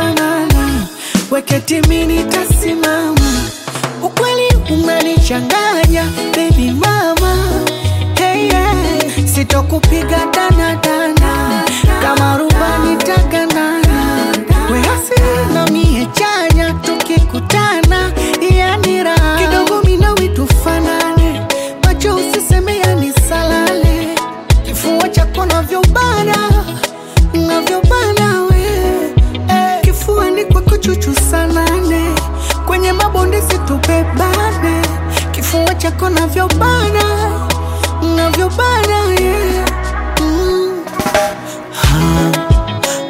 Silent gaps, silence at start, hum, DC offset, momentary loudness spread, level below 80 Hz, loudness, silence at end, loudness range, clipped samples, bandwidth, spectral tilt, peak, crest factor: none; 0 s; none; under 0.1%; 4 LU; -18 dBFS; -12 LUFS; 0 s; 2 LU; under 0.1%; 16.5 kHz; -5 dB/octave; 0 dBFS; 12 dB